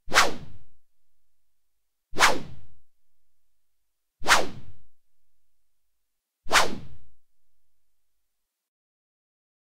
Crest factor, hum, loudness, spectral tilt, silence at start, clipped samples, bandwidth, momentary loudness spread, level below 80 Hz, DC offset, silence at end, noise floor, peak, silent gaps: 24 dB; none; -23 LUFS; -1 dB/octave; 0.1 s; under 0.1%; 16 kHz; 18 LU; -52 dBFS; under 0.1%; 2.1 s; -78 dBFS; -2 dBFS; none